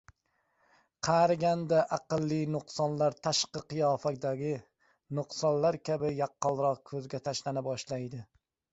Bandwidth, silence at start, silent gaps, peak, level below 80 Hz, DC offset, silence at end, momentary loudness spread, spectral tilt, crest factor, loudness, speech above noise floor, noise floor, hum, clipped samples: 8.2 kHz; 1.05 s; none; -14 dBFS; -68 dBFS; under 0.1%; 0.5 s; 11 LU; -5 dB/octave; 18 dB; -31 LUFS; 45 dB; -76 dBFS; none; under 0.1%